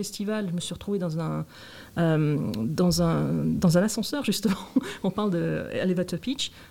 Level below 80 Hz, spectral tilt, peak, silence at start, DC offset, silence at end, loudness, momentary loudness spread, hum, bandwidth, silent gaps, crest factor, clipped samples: -52 dBFS; -6 dB/octave; -10 dBFS; 0 s; 0.2%; 0.05 s; -26 LUFS; 8 LU; none; 17 kHz; none; 18 dB; under 0.1%